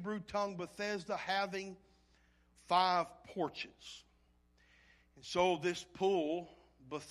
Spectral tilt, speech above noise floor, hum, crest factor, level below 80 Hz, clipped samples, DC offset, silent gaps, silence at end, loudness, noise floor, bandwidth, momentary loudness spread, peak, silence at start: -4.5 dB/octave; 34 dB; 60 Hz at -65 dBFS; 22 dB; -70 dBFS; under 0.1%; under 0.1%; none; 0 s; -37 LUFS; -71 dBFS; 13 kHz; 18 LU; -18 dBFS; 0 s